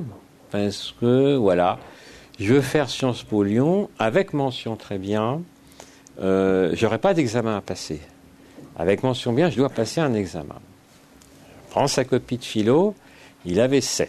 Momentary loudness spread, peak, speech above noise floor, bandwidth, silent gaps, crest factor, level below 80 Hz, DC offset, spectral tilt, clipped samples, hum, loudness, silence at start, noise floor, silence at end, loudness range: 12 LU; -6 dBFS; 30 dB; 13.5 kHz; none; 16 dB; -54 dBFS; under 0.1%; -5.5 dB/octave; under 0.1%; none; -22 LUFS; 0 s; -51 dBFS; 0 s; 3 LU